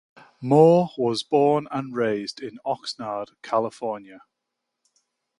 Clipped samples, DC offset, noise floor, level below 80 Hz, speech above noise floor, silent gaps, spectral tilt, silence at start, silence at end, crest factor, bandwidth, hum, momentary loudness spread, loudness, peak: under 0.1%; under 0.1%; -82 dBFS; -68 dBFS; 59 dB; none; -6.5 dB/octave; 0.4 s; 1.2 s; 22 dB; 11 kHz; none; 16 LU; -23 LUFS; -2 dBFS